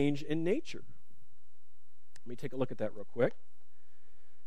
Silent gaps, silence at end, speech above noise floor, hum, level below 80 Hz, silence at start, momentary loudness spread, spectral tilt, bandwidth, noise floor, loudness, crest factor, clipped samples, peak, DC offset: none; 1.15 s; 39 dB; none; -72 dBFS; 0 s; 17 LU; -7 dB/octave; 13 kHz; -75 dBFS; -36 LUFS; 22 dB; under 0.1%; -16 dBFS; 2%